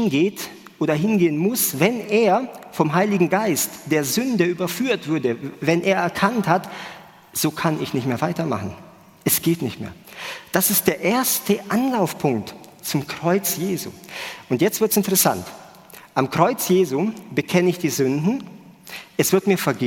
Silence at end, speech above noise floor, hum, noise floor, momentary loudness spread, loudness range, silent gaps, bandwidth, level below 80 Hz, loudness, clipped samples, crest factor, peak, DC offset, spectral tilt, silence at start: 0 s; 24 dB; none; -45 dBFS; 14 LU; 4 LU; none; 17 kHz; -60 dBFS; -21 LUFS; under 0.1%; 20 dB; -2 dBFS; under 0.1%; -4.5 dB/octave; 0 s